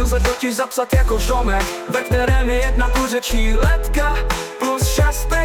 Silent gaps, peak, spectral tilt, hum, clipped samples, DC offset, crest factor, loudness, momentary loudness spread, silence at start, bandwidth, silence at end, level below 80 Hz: none; -6 dBFS; -4.5 dB/octave; none; under 0.1%; under 0.1%; 12 dB; -19 LUFS; 4 LU; 0 s; 18 kHz; 0 s; -18 dBFS